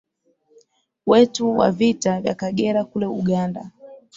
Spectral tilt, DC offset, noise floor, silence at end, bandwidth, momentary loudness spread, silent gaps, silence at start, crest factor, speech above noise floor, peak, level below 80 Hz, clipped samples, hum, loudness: -6 dB/octave; under 0.1%; -63 dBFS; 0.2 s; 7.8 kHz; 12 LU; none; 1.05 s; 18 dB; 44 dB; -2 dBFS; -58 dBFS; under 0.1%; none; -20 LUFS